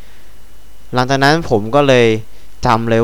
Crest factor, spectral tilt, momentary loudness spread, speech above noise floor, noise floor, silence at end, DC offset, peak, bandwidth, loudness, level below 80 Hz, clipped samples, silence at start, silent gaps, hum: 16 dB; -5.5 dB/octave; 10 LU; 28 dB; -40 dBFS; 0 s; 6%; 0 dBFS; 19 kHz; -13 LUFS; -38 dBFS; under 0.1%; 0.5 s; none; none